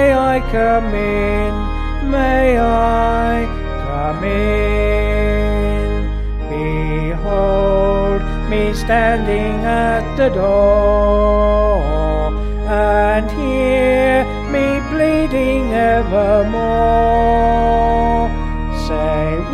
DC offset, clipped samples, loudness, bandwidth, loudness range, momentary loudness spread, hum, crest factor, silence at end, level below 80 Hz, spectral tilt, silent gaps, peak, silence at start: under 0.1%; under 0.1%; -16 LUFS; 12 kHz; 3 LU; 7 LU; none; 12 dB; 0 s; -20 dBFS; -7.5 dB/octave; none; -2 dBFS; 0 s